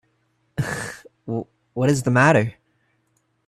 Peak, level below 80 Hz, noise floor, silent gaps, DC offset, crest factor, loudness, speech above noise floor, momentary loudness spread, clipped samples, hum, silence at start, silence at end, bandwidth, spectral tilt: -2 dBFS; -56 dBFS; -68 dBFS; none; under 0.1%; 20 dB; -21 LUFS; 49 dB; 18 LU; under 0.1%; none; 0.55 s; 0.95 s; 13.5 kHz; -6 dB/octave